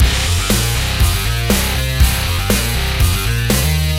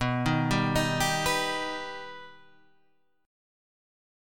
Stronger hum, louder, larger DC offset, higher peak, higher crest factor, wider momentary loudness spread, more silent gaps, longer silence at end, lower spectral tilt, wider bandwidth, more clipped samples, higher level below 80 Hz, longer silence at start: neither; first, -15 LUFS vs -27 LUFS; second, under 0.1% vs 0.3%; first, 0 dBFS vs -14 dBFS; about the same, 14 dB vs 18 dB; second, 2 LU vs 15 LU; neither; second, 0 s vs 1 s; about the same, -4 dB/octave vs -4.5 dB/octave; second, 17 kHz vs 19 kHz; neither; first, -18 dBFS vs -50 dBFS; about the same, 0 s vs 0 s